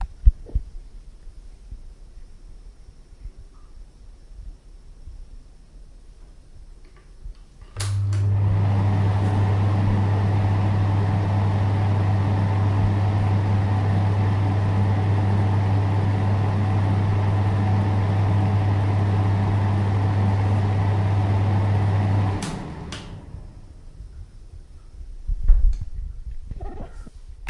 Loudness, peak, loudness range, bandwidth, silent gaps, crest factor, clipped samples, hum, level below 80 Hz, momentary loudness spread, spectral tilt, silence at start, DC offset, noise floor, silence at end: -22 LUFS; -2 dBFS; 10 LU; 11 kHz; none; 20 dB; under 0.1%; none; -30 dBFS; 16 LU; -8 dB/octave; 0 s; under 0.1%; -44 dBFS; 0 s